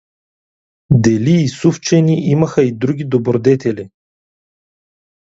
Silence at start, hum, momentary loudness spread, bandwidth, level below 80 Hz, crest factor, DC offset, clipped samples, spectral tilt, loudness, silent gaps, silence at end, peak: 0.9 s; none; 4 LU; 8 kHz; -48 dBFS; 16 dB; under 0.1%; under 0.1%; -7 dB/octave; -14 LUFS; none; 1.35 s; 0 dBFS